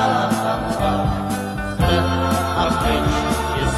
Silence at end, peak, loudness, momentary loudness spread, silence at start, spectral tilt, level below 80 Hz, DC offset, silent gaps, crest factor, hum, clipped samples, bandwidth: 0 s; -4 dBFS; -20 LUFS; 5 LU; 0 s; -5.5 dB/octave; -30 dBFS; under 0.1%; none; 14 dB; none; under 0.1%; 14 kHz